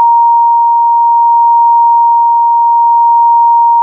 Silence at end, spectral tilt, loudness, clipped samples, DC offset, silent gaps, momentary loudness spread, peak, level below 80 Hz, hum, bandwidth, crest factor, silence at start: 0 s; 8 dB/octave; -7 LUFS; under 0.1%; under 0.1%; none; 1 LU; -2 dBFS; under -90 dBFS; none; 1.1 kHz; 4 dB; 0 s